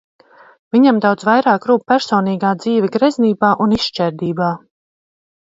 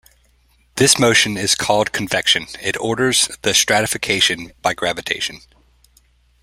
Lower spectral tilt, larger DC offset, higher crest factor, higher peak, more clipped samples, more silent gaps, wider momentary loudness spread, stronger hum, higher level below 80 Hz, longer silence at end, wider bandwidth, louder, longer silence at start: first, -6.5 dB/octave vs -2 dB/octave; neither; about the same, 16 dB vs 20 dB; about the same, 0 dBFS vs 0 dBFS; neither; neither; about the same, 7 LU vs 9 LU; neither; about the same, -54 dBFS vs -50 dBFS; about the same, 1 s vs 1.05 s; second, 7.8 kHz vs 16 kHz; about the same, -15 LUFS vs -16 LUFS; about the same, 0.75 s vs 0.75 s